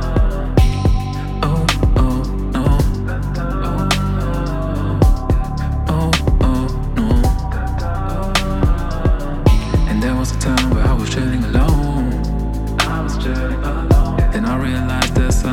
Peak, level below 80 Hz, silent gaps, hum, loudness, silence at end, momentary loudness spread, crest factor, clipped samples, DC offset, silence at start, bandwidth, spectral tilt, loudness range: -2 dBFS; -18 dBFS; none; none; -18 LUFS; 0 s; 6 LU; 14 dB; under 0.1%; under 0.1%; 0 s; 16 kHz; -6 dB/octave; 1 LU